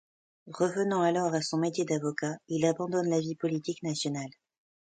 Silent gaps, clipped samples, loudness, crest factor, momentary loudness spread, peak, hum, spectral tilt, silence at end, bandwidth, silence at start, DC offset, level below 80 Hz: none; under 0.1%; -30 LUFS; 18 dB; 7 LU; -12 dBFS; none; -5.5 dB/octave; 0.65 s; 9.4 kHz; 0.45 s; under 0.1%; -74 dBFS